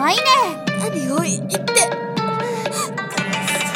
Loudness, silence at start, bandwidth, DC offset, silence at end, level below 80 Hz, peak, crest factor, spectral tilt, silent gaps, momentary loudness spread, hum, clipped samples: -19 LUFS; 0 s; 16.5 kHz; under 0.1%; 0 s; -62 dBFS; 0 dBFS; 18 dB; -3 dB/octave; none; 8 LU; none; under 0.1%